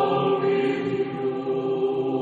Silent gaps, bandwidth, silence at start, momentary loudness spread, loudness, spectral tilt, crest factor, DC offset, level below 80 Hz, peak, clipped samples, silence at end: none; 7.4 kHz; 0 s; 5 LU; -24 LUFS; -8 dB/octave; 12 dB; under 0.1%; -66 dBFS; -10 dBFS; under 0.1%; 0 s